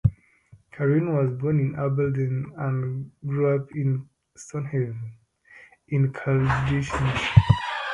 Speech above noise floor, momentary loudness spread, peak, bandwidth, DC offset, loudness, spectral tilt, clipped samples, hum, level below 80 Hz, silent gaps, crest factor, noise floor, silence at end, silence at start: 32 dB; 11 LU; 0 dBFS; 10 kHz; under 0.1%; -24 LUFS; -7.5 dB/octave; under 0.1%; none; -42 dBFS; none; 24 dB; -55 dBFS; 0 s; 0.05 s